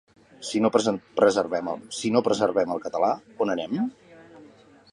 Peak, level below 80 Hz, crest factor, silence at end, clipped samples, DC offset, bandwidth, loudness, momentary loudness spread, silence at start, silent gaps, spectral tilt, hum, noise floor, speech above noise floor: -4 dBFS; -66 dBFS; 20 dB; 0.5 s; under 0.1%; under 0.1%; 11 kHz; -25 LUFS; 8 LU; 0.4 s; none; -5 dB/octave; none; -52 dBFS; 28 dB